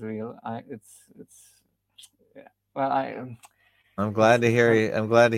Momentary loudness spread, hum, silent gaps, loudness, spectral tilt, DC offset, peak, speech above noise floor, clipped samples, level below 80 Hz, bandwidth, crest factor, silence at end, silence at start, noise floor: 22 LU; none; none; -23 LUFS; -6 dB/octave; under 0.1%; -4 dBFS; 33 dB; under 0.1%; -68 dBFS; 15.5 kHz; 22 dB; 0 s; 0 s; -56 dBFS